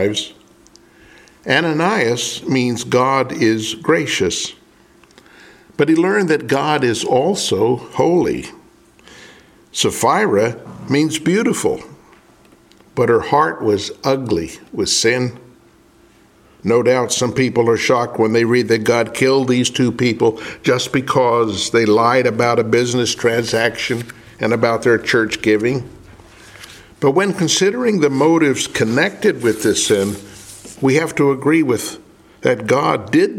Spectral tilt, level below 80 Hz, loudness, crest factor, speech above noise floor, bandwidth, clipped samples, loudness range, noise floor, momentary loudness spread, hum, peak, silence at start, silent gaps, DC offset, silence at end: -4.5 dB/octave; -52 dBFS; -16 LUFS; 16 dB; 34 dB; 16.5 kHz; under 0.1%; 3 LU; -50 dBFS; 8 LU; none; 0 dBFS; 0 s; none; under 0.1%; 0 s